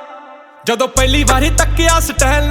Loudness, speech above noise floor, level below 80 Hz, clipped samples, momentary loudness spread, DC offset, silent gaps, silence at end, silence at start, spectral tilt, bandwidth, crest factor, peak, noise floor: -13 LUFS; 25 dB; -18 dBFS; under 0.1%; 8 LU; under 0.1%; none; 0 s; 0 s; -3.5 dB/octave; 18 kHz; 14 dB; 0 dBFS; -37 dBFS